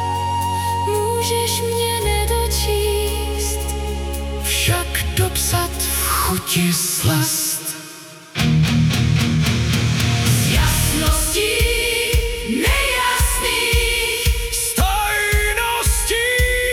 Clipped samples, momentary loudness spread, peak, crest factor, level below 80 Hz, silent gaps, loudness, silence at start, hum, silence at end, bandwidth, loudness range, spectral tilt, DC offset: under 0.1%; 6 LU; -4 dBFS; 14 dB; -26 dBFS; none; -18 LUFS; 0 s; none; 0 s; 18 kHz; 3 LU; -3.5 dB/octave; under 0.1%